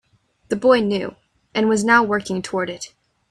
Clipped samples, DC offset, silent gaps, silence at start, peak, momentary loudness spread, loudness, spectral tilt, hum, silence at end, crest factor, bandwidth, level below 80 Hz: under 0.1%; under 0.1%; none; 0.5 s; -2 dBFS; 15 LU; -19 LUFS; -4.5 dB/octave; none; 0.45 s; 20 dB; 12 kHz; -58 dBFS